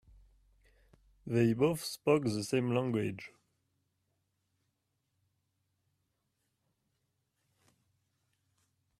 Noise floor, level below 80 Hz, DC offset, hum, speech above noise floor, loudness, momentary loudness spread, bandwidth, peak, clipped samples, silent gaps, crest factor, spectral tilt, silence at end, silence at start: -82 dBFS; -68 dBFS; under 0.1%; none; 51 dB; -32 LUFS; 16 LU; 15 kHz; -14 dBFS; under 0.1%; none; 24 dB; -6 dB/octave; 5.7 s; 1.25 s